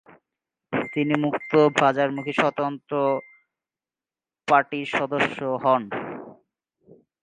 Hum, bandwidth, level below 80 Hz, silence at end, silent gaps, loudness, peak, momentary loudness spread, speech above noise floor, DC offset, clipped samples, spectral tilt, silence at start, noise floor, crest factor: none; 9.6 kHz; -68 dBFS; 0.9 s; none; -23 LUFS; -4 dBFS; 11 LU; over 68 dB; under 0.1%; under 0.1%; -6 dB/octave; 0.7 s; under -90 dBFS; 22 dB